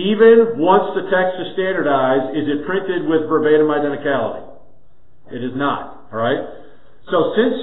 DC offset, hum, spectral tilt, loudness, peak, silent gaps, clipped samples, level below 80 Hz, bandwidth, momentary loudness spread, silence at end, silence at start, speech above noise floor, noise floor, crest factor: 2%; none; -11 dB/octave; -17 LUFS; 0 dBFS; none; under 0.1%; -56 dBFS; 4.1 kHz; 13 LU; 0 s; 0 s; 38 dB; -54 dBFS; 16 dB